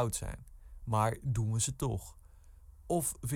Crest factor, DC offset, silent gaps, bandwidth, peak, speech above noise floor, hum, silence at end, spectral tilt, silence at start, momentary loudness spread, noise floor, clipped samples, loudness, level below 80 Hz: 18 dB; under 0.1%; none; 17.5 kHz; -16 dBFS; 22 dB; none; 0 s; -5 dB/octave; 0 s; 16 LU; -56 dBFS; under 0.1%; -34 LUFS; -50 dBFS